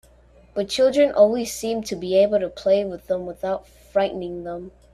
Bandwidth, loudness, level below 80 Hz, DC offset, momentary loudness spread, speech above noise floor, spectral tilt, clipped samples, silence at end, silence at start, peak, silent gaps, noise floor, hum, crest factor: 14 kHz; -22 LUFS; -52 dBFS; under 0.1%; 13 LU; 31 dB; -4.5 dB/octave; under 0.1%; 0.25 s; 0.55 s; -4 dBFS; none; -52 dBFS; none; 18 dB